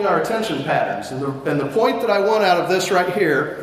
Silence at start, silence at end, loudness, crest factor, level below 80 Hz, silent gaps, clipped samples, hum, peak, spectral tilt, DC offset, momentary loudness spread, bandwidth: 0 s; 0 s; -19 LUFS; 14 dB; -58 dBFS; none; under 0.1%; none; -4 dBFS; -5 dB/octave; under 0.1%; 7 LU; 15.5 kHz